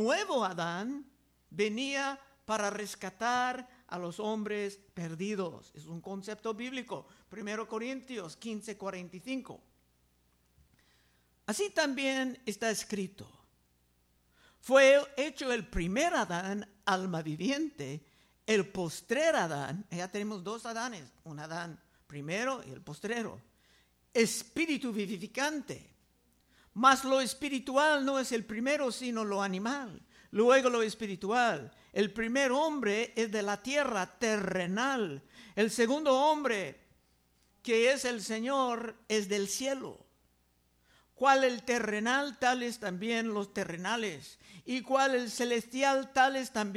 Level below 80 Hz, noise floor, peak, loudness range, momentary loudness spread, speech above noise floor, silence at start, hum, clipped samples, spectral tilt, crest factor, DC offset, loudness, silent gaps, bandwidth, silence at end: -62 dBFS; -71 dBFS; -10 dBFS; 10 LU; 16 LU; 39 dB; 0 s; 60 Hz at -65 dBFS; under 0.1%; -3.5 dB/octave; 22 dB; under 0.1%; -32 LUFS; none; 16 kHz; 0 s